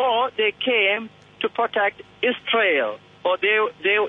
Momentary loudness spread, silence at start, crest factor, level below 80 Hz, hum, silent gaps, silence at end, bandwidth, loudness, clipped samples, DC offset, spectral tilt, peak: 9 LU; 0 s; 14 dB; -68 dBFS; none; none; 0 s; 4.3 kHz; -21 LUFS; under 0.1%; under 0.1%; -5 dB/octave; -6 dBFS